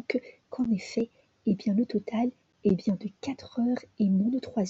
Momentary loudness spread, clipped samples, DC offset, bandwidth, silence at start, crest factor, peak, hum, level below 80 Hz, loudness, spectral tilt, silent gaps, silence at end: 8 LU; under 0.1%; under 0.1%; 7.8 kHz; 0.1 s; 16 dB; -14 dBFS; none; -64 dBFS; -30 LUFS; -7.5 dB/octave; none; 0 s